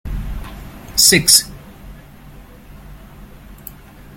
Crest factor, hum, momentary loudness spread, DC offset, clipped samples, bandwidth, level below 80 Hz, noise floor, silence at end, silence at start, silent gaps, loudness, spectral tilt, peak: 20 dB; none; 27 LU; under 0.1%; under 0.1%; 17 kHz; -34 dBFS; -39 dBFS; 0.45 s; 0.05 s; none; -11 LUFS; -1.5 dB/octave; 0 dBFS